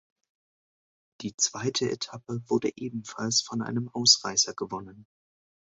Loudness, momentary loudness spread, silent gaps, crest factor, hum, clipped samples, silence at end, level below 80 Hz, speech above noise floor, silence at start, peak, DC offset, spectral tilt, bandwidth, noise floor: -26 LUFS; 17 LU; 1.34-1.38 s; 26 dB; none; under 0.1%; 0.75 s; -68 dBFS; over 61 dB; 1.2 s; -6 dBFS; under 0.1%; -2.5 dB/octave; 8.4 kHz; under -90 dBFS